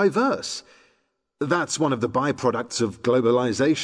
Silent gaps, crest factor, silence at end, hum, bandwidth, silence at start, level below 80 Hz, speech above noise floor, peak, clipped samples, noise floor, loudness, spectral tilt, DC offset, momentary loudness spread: none; 14 dB; 0 s; none; 11 kHz; 0 s; -62 dBFS; 48 dB; -8 dBFS; under 0.1%; -70 dBFS; -23 LUFS; -4.5 dB/octave; under 0.1%; 8 LU